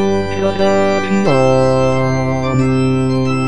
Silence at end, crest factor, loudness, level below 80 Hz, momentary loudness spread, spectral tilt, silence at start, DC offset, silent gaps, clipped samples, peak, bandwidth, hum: 0 s; 12 dB; -14 LUFS; -38 dBFS; 4 LU; -7 dB/octave; 0 s; 6%; none; under 0.1%; 0 dBFS; 10 kHz; none